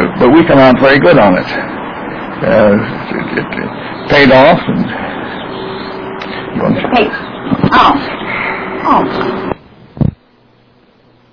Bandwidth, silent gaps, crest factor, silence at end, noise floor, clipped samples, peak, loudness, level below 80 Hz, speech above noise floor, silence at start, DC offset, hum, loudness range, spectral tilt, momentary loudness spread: 5.4 kHz; none; 12 dB; 1.2 s; -47 dBFS; 0.4%; 0 dBFS; -11 LUFS; -36 dBFS; 38 dB; 0 s; under 0.1%; none; 5 LU; -8 dB/octave; 16 LU